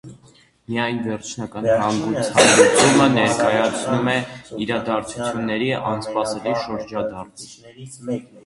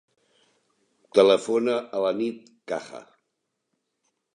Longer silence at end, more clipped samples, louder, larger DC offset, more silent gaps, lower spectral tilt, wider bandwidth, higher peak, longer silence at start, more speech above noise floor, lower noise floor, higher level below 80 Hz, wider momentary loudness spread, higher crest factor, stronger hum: second, 0.05 s vs 1.35 s; neither; first, -19 LUFS vs -24 LUFS; neither; neither; about the same, -4 dB/octave vs -4.5 dB/octave; about the same, 11.5 kHz vs 10.5 kHz; first, 0 dBFS vs -4 dBFS; second, 0.05 s vs 1.15 s; second, 33 dB vs 56 dB; second, -53 dBFS vs -79 dBFS; first, -54 dBFS vs -76 dBFS; second, 18 LU vs 23 LU; about the same, 20 dB vs 22 dB; neither